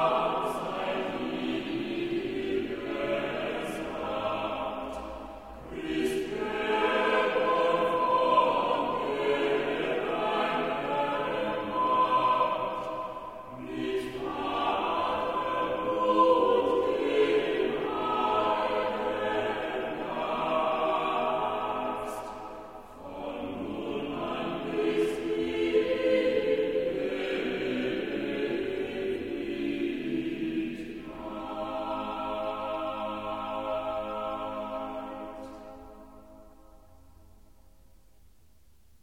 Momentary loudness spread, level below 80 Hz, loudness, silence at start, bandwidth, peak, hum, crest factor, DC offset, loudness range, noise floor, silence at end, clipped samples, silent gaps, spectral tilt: 13 LU; -58 dBFS; -30 LUFS; 0 s; 16 kHz; -12 dBFS; none; 18 dB; 0.1%; 8 LU; -62 dBFS; 2.25 s; under 0.1%; none; -5.5 dB/octave